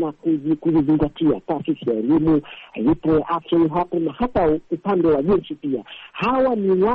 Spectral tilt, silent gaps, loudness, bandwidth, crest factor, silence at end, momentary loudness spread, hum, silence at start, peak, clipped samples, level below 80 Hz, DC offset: -10 dB/octave; none; -20 LUFS; 4.6 kHz; 10 dB; 0 s; 7 LU; none; 0 s; -10 dBFS; under 0.1%; -42 dBFS; under 0.1%